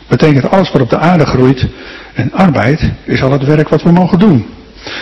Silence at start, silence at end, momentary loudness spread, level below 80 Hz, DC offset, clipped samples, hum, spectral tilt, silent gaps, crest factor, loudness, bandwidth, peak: 0.1 s; 0 s; 12 LU; -32 dBFS; 0.8%; 3%; none; -8 dB/octave; none; 10 dB; -10 LUFS; 7.4 kHz; 0 dBFS